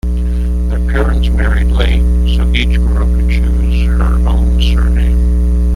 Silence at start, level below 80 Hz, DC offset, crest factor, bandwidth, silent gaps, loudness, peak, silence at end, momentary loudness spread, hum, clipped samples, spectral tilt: 0.05 s; -10 dBFS; under 0.1%; 8 dB; 10 kHz; none; -13 LUFS; -2 dBFS; 0 s; 3 LU; 60 Hz at -10 dBFS; under 0.1%; -7 dB/octave